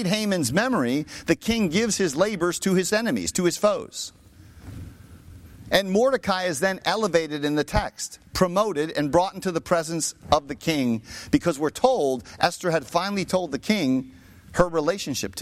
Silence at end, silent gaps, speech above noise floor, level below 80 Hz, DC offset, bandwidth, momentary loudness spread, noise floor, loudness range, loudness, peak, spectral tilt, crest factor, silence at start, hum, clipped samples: 0 s; none; 22 dB; -46 dBFS; under 0.1%; 16.5 kHz; 7 LU; -45 dBFS; 3 LU; -24 LUFS; -4 dBFS; -4.5 dB/octave; 20 dB; 0 s; none; under 0.1%